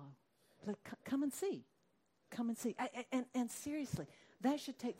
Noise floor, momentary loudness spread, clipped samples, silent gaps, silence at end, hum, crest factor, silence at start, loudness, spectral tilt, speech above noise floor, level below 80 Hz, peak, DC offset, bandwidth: -79 dBFS; 11 LU; under 0.1%; none; 0 s; none; 16 dB; 0 s; -42 LUFS; -5 dB/octave; 37 dB; -74 dBFS; -26 dBFS; under 0.1%; 16 kHz